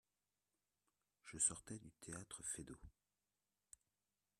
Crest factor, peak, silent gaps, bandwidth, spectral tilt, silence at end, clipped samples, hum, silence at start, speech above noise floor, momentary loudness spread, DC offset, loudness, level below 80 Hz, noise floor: 28 dB; -24 dBFS; none; 13.5 kHz; -2.5 dB/octave; 1.5 s; under 0.1%; 50 Hz at -80 dBFS; 1.25 s; over 42 dB; 27 LU; under 0.1%; -45 LUFS; -74 dBFS; under -90 dBFS